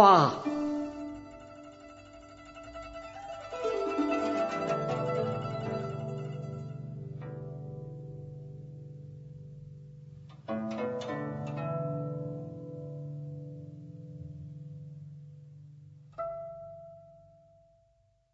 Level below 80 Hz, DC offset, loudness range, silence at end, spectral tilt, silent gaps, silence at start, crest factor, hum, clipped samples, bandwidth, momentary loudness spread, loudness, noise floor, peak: -64 dBFS; under 0.1%; 13 LU; 1 s; -5.5 dB/octave; none; 0 s; 28 dB; none; under 0.1%; 7.6 kHz; 19 LU; -34 LUFS; -69 dBFS; -6 dBFS